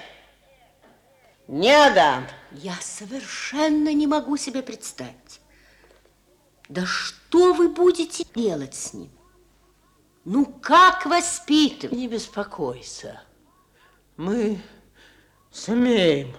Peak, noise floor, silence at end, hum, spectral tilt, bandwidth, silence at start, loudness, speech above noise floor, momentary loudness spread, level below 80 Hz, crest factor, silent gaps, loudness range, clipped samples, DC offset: -4 dBFS; -60 dBFS; 0 s; 50 Hz at -60 dBFS; -3.5 dB/octave; 13 kHz; 0 s; -21 LUFS; 39 dB; 20 LU; -58 dBFS; 18 dB; none; 9 LU; under 0.1%; under 0.1%